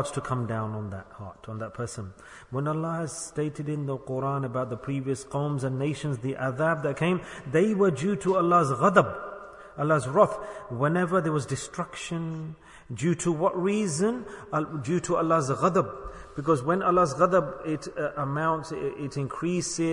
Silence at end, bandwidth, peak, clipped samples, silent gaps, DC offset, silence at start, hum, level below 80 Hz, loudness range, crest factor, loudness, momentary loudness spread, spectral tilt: 0 s; 11 kHz; -4 dBFS; under 0.1%; none; under 0.1%; 0 s; none; -56 dBFS; 7 LU; 24 dB; -27 LUFS; 15 LU; -6 dB/octave